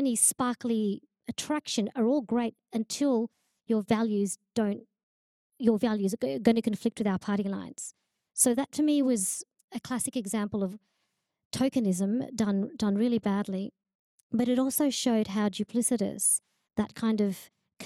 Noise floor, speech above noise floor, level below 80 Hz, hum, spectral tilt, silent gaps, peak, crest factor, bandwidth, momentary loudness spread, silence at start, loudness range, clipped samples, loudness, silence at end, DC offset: -79 dBFS; 51 dB; -68 dBFS; none; -4.5 dB/octave; 5.03-5.50 s, 9.64-9.68 s, 11.45-11.51 s, 13.95-14.30 s; -10 dBFS; 20 dB; 15 kHz; 11 LU; 0 s; 3 LU; under 0.1%; -29 LUFS; 0 s; under 0.1%